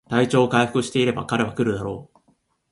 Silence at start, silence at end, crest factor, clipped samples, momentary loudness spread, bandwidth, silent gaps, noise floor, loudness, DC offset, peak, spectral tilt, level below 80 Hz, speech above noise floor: 0.1 s; 0.7 s; 18 dB; under 0.1%; 11 LU; 11.5 kHz; none; -65 dBFS; -21 LUFS; under 0.1%; -4 dBFS; -5.5 dB/octave; -54 dBFS; 44 dB